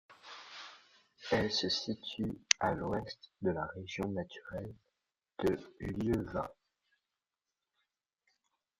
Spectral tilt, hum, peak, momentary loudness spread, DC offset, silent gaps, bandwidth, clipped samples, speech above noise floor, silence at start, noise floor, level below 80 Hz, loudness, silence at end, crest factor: -3.5 dB/octave; none; -2 dBFS; 19 LU; under 0.1%; none; 14 kHz; under 0.1%; over 54 dB; 0.1 s; under -90 dBFS; -60 dBFS; -36 LUFS; 2.3 s; 38 dB